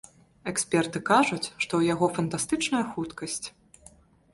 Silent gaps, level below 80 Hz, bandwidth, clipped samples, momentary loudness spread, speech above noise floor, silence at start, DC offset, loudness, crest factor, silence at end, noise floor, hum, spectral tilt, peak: none; -62 dBFS; 11.5 kHz; under 0.1%; 11 LU; 29 dB; 0.45 s; under 0.1%; -27 LUFS; 20 dB; 0.85 s; -56 dBFS; none; -4 dB/octave; -8 dBFS